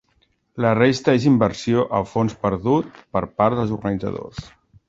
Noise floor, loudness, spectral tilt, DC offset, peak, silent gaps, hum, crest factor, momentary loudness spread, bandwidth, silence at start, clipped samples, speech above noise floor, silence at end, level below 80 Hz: -64 dBFS; -20 LUFS; -7 dB/octave; under 0.1%; -2 dBFS; none; none; 18 dB; 12 LU; 8 kHz; 0.55 s; under 0.1%; 45 dB; 0.4 s; -48 dBFS